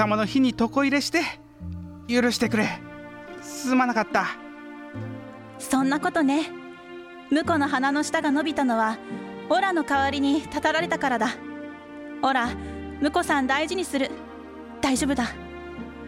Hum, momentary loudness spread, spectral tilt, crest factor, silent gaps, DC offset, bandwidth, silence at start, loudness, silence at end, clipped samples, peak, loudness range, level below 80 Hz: none; 17 LU; -4 dB/octave; 18 dB; none; under 0.1%; 16 kHz; 0 s; -24 LUFS; 0 s; under 0.1%; -8 dBFS; 3 LU; -52 dBFS